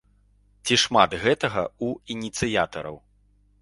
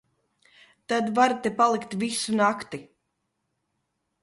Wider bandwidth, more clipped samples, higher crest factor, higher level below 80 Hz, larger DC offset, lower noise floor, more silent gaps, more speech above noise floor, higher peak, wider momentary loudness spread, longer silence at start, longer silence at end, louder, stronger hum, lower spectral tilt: about the same, 11.5 kHz vs 11.5 kHz; neither; about the same, 24 dB vs 20 dB; first, -52 dBFS vs -70 dBFS; neither; second, -61 dBFS vs -78 dBFS; neither; second, 37 dB vs 54 dB; first, -2 dBFS vs -8 dBFS; about the same, 13 LU vs 11 LU; second, 0.65 s vs 0.9 s; second, 0.65 s vs 1.4 s; about the same, -23 LUFS vs -24 LUFS; first, 50 Hz at -55 dBFS vs none; about the same, -3.5 dB/octave vs -4 dB/octave